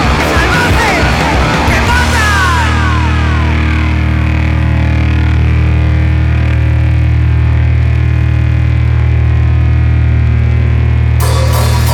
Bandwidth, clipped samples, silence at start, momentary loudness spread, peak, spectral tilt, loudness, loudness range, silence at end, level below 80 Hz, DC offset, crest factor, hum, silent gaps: 15 kHz; under 0.1%; 0 s; 2 LU; 0 dBFS; -6 dB/octave; -10 LUFS; 1 LU; 0 s; -14 dBFS; under 0.1%; 8 dB; none; none